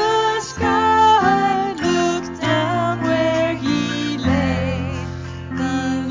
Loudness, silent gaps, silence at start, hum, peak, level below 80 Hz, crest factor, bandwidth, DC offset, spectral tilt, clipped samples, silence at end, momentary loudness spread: -18 LUFS; none; 0 s; none; -4 dBFS; -36 dBFS; 14 dB; 7.6 kHz; under 0.1%; -5.5 dB/octave; under 0.1%; 0 s; 11 LU